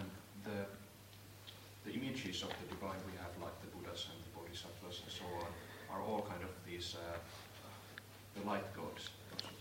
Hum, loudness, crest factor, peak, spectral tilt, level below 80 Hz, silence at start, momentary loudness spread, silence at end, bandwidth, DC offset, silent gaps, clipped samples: none; -47 LUFS; 24 dB; -22 dBFS; -4.5 dB/octave; -68 dBFS; 0 s; 12 LU; 0 s; 16 kHz; under 0.1%; none; under 0.1%